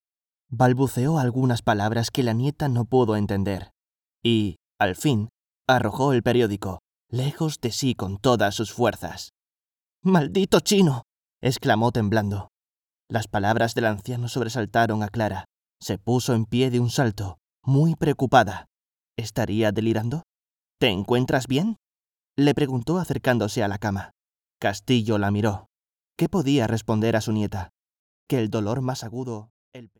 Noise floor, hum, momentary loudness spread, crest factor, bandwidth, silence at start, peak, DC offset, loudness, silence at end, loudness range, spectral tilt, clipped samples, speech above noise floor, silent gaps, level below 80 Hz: under -90 dBFS; none; 12 LU; 22 dB; 19 kHz; 0.5 s; -2 dBFS; under 0.1%; -23 LUFS; 0.15 s; 3 LU; -6 dB/octave; under 0.1%; over 68 dB; 9.82-9.86 s, 18.80-18.84 s, 21.88-21.92 s, 27.99-28.27 s, 29.50-29.72 s; -52 dBFS